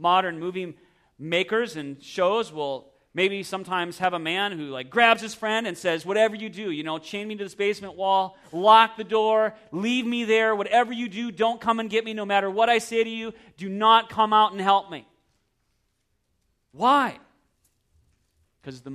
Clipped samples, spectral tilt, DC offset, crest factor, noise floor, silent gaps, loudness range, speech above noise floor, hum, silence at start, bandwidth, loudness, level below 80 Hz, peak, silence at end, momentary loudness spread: under 0.1%; -4 dB/octave; under 0.1%; 22 dB; -73 dBFS; none; 6 LU; 49 dB; none; 0 s; 14 kHz; -23 LUFS; -68 dBFS; -4 dBFS; 0 s; 15 LU